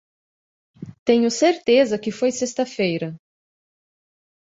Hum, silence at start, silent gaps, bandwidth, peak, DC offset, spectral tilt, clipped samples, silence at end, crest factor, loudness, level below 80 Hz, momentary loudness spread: none; 0.8 s; 0.99-1.06 s; 8 kHz; -4 dBFS; under 0.1%; -4.5 dB/octave; under 0.1%; 1.35 s; 18 dB; -20 LUFS; -64 dBFS; 13 LU